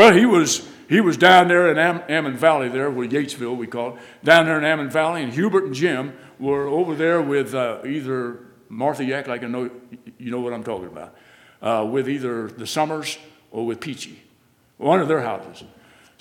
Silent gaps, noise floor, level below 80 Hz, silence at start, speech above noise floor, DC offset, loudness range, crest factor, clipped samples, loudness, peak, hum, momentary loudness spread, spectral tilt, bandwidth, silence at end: none; -59 dBFS; -66 dBFS; 0 s; 39 dB; under 0.1%; 10 LU; 20 dB; under 0.1%; -20 LUFS; 0 dBFS; none; 17 LU; -4.5 dB/octave; 16.5 kHz; 0.55 s